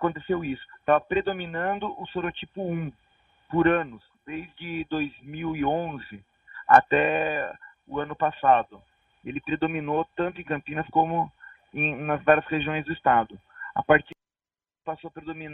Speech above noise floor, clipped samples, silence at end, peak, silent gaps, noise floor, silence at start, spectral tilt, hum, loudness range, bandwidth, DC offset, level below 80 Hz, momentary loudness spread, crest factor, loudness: over 64 dB; under 0.1%; 0 s; -2 dBFS; none; under -90 dBFS; 0 s; -8 dB/octave; none; 6 LU; 6 kHz; under 0.1%; -56 dBFS; 17 LU; 26 dB; -25 LUFS